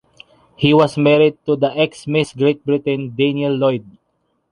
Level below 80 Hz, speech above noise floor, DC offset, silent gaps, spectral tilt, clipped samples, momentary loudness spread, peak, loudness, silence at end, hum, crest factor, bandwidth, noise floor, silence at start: -54 dBFS; 51 dB; under 0.1%; none; -7 dB/octave; under 0.1%; 6 LU; -2 dBFS; -17 LUFS; 0.7 s; none; 16 dB; 11 kHz; -67 dBFS; 0.6 s